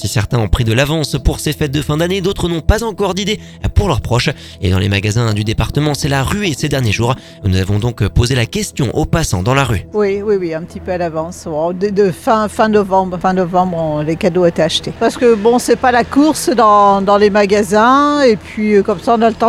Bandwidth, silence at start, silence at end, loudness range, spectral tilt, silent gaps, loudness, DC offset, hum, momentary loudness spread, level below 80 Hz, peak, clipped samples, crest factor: 19 kHz; 0 s; 0 s; 5 LU; -5.5 dB/octave; none; -14 LUFS; under 0.1%; none; 8 LU; -28 dBFS; 0 dBFS; under 0.1%; 14 dB